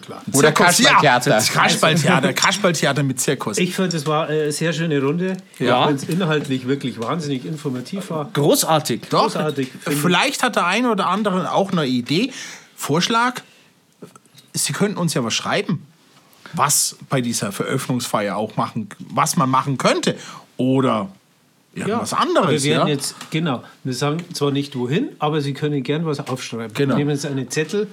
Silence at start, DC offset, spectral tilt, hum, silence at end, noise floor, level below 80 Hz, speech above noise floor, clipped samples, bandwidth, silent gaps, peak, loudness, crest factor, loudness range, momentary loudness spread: 0 s; under 0.1%; -4 dB/octave; none; 0 s; -57 dBFS; -68 dBFS; 38 dB; under 0.1%; 18 kHz; none; -2 dBFS; -19 LUFS; 16 dB; 5 LU; 11 LU